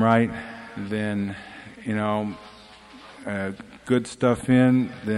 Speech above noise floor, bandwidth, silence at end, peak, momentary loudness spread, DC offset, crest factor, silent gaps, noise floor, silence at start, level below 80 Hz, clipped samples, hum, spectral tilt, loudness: 24 dB; 11.5 kHz; 0 s; -4 dBFS; 21 LU; under 0.1%; 20 dB; none; -47 dBFS; 0 s; -56 dBFS; under 0.1%; none; -7 dB/octave; -24 LUFS